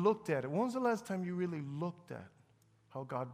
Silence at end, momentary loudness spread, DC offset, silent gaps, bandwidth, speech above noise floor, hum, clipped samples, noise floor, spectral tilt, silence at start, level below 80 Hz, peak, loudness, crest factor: 0 s; 16 LU; under 0.1%; none; 15.5 kHz; 33 dB; none; under 0.1%; -69 dBFS; -7.5 dB/octave; 0 s; -78 dBFS; -18 dBFS; -37 LUFS; 18 dB